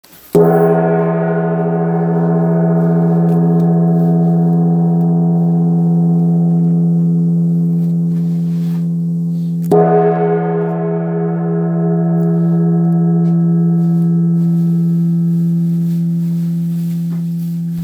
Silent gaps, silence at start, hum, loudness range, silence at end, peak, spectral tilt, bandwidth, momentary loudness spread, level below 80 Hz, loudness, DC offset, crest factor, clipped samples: none; 0.35 s; none; 2 LU; 0 s; 0 dBFS; -11 dB/octave; 2.5 kHz; 5 LU; -58 dBFS; -14 LUFS; under 0.1%; 12 dB; under 0.1%